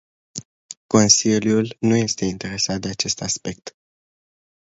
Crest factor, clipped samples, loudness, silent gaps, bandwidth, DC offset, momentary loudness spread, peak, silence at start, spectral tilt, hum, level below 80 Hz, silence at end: 22 dB; under 0.1%; -19 LUFS; 0.45-0.69 s, 0.77-0.89 s; 8 kHz; under 0.1%; 22 LU; 0 dBFS; 0.35 s; -3.5 dB/octave; none; -52 dBFS; 1 s